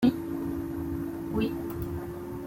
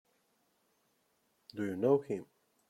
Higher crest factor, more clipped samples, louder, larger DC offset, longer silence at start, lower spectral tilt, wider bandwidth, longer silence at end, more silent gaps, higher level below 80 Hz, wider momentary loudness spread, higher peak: about the same, 18 dB vs 22 dB; neither; about the same, -33 LUFS vs -34 LUFS; neither; second, 0 s vs 1.55 s; about the same, -7.5 dB/octave vs -8 dB/octave; first, 16.5 kHz vs 12.5 kHz; second, 0 s vs 0.45 s; neither; first, -48 dBFS vs -80 dBFS; second, 5 LU vs 12 LU; first, -12 dBFS vs -16 dBFS